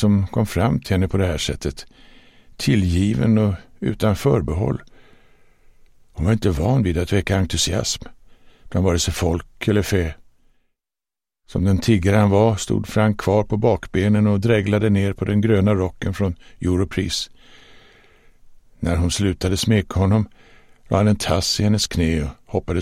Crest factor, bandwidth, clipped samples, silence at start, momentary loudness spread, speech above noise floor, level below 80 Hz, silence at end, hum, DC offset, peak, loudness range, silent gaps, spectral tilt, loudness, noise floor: 16 dB; 15.5 kHz; under 0.1%; 0 s; 8 LU; over 71 dB; -36 dBFS; 0 s; none; under 0.1%; -4 dBFS; 5 LU; none; -6 dB/octave; -20 LUFS; under -90 dBFS